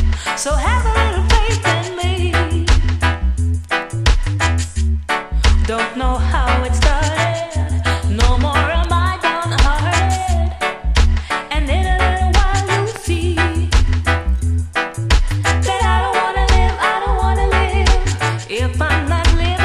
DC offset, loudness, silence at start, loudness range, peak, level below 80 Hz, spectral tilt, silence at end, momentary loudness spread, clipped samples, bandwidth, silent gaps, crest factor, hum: under 0.1%; -17 LUFS; 0 s; 1 LU; 0 dBFS; -18 dBFS; -5 dB/octave; 0 s; 4 LU; under 0.1%; 12.5 kHz; none; 14 dB; none